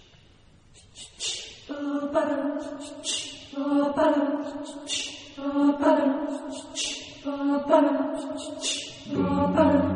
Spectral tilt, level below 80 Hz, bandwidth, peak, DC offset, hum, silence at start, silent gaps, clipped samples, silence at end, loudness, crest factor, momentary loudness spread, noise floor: -4.5 dB/octave; -56 dBFS; 10 kHz; -6 dBFS; under 0.1%; none; 0.95 s; none; under 0.1%; 0 s; -26 LUFS; 20 dB; 14 LU; -55 dBFS